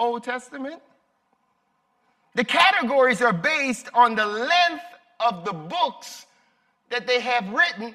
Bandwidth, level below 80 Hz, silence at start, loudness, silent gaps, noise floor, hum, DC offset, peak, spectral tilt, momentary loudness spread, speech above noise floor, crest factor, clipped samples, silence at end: 14.5 kHz; -72 dBFS; 0 s; -21 LUFS; none; -69 dBFS; none; under 0.1%; -4 dBFS; -3.5 dB/octave; 18 LU; 47 dB; 20 dB; under 0.1%; 0 s